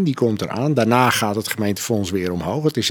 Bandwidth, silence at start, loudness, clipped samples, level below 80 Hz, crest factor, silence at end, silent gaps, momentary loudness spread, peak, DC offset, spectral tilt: 17.5 kHz; 0 s; -20 LUFS; under 0.1%; -52 dBFS; 18 dB; 0 s; none; 7 LU; 0 dBFS; under 0.1%; -5 dB/octave